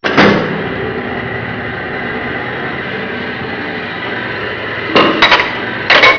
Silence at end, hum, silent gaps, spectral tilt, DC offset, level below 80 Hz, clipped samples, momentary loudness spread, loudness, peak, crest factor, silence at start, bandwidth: 0 s; none; none; -5 dB/octave; under 0.1%; -42 dBFS; 0.3%; 12 LU; -14 LUFS; 0 dBFS; 14 dB; 0 s; 5.4 kHz